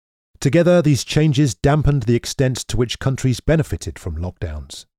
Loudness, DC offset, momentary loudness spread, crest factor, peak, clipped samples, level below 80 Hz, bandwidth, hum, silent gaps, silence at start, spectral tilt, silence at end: -18 LUFS; under 0.1%; 13 LU; 16 dB; -2 dBFS; under 0.1%; -32 dBFS; 15 kHz; none; none; 0.4 s; -6 dB/octave; 0.15 s